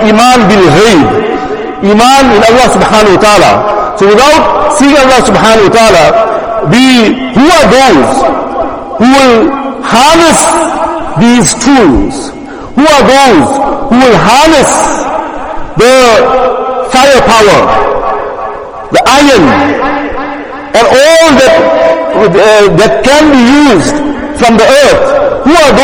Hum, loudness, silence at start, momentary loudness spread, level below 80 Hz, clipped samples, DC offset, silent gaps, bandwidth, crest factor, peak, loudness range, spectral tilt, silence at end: none; -5 LUFS; 0 s; 10 LU; -28 dBFS; 9%; under 0.1%; none; over 20 kHz; 4 dB; 0 dBFS; 2 LU; -4 dB/octave; 0 s